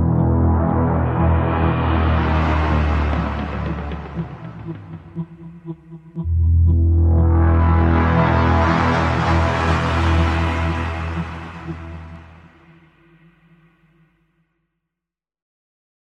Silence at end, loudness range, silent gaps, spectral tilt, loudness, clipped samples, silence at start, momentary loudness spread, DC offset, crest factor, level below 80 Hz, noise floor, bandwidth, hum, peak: 3.85 s; 13 LU; none; -8 dB/octave; -18 LUFS; under 0.1%; 0 s; 17 LU; under 0.1%; 16 dB; -28 dBFS; -86 dBFS; 7 kHz; none; -4 dBFS